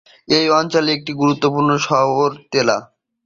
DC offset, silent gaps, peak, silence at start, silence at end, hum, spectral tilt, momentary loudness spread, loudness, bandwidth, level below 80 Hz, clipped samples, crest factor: under 0.1%; none; -2 dBFS; 0.3 s; 0.4 s; none; -4.5 dB/octave; 4 LU; -17 LUFS; 7.6 kHz; -58 dBFS; under 0.1%; 16 dB